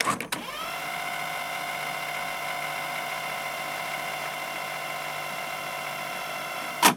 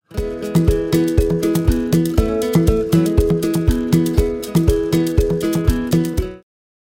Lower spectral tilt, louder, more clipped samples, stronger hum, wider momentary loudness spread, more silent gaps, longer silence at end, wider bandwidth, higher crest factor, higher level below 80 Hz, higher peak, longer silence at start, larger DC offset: second, -1.5 dB/octave vs -7 dB/octave; second, -30 LUFS vs -17 LUFS; neither; neither; about the same, 2 LU vs 4 LU; neither; second, 0 s vs 0.45 s; first, 19.5 kHz vs 17 kHz; first, 26 dB vs 16 dB; second, -68 dBFS vs -24 dBFS; second, -4 dBFS vs 0 dBFS; about the same, 0 s vs 0.1 s; neither